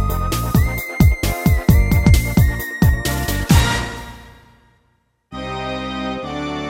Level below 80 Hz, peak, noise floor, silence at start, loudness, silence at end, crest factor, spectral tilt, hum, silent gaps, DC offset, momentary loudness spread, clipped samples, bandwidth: -22 dBFS; 0 dBFS; -63 dBFS; 0 s; -18 LUFS; 0 s; 18 dB; -5.5 dB/octave; none; none; under 0.1%; 13 LU; under 0.1%; 16.5 kHz